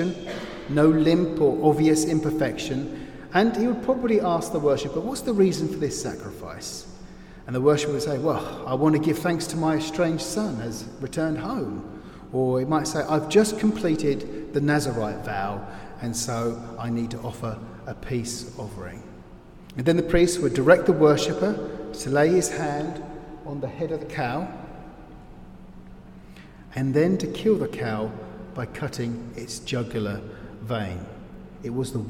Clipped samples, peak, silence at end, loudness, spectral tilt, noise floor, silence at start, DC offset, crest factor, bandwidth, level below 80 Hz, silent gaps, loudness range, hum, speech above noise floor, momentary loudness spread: under 0.1%; -4 dBFS; 0 s; -24 LUFS; -5.5 dB/octave; -45 dBFS; 0 s; under 0.1%; 22 dB; 16.5 kHz; -46 dBFS; none; 9 LU; none; 21 dB; 17 LU